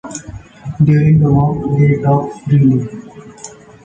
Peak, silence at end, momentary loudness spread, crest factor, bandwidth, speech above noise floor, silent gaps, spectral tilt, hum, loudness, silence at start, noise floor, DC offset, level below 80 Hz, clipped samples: -2 dBFS; 0.35 s; 22 LU; 12 dB; 8.8 kHz; 24 dB; none; -8.5 dB/octave; none; -13 LUFS; 0.05 s; -36 dBFS; under 0.1%; -40 dBFS; under 0.1%